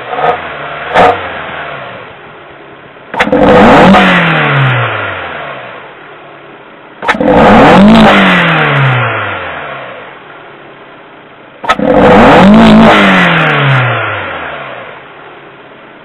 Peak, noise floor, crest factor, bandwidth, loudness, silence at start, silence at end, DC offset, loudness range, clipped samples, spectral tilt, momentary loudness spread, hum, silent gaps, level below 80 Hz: 0 dBFS; -33 dBFS; 8 dB; 10.5 kHz; -6 LUFS; 0 s; 0.55 s; under 0.1%; 8 LU; 4%; -6.5 dB/octave; 21 LU; none; none; -32 dBFS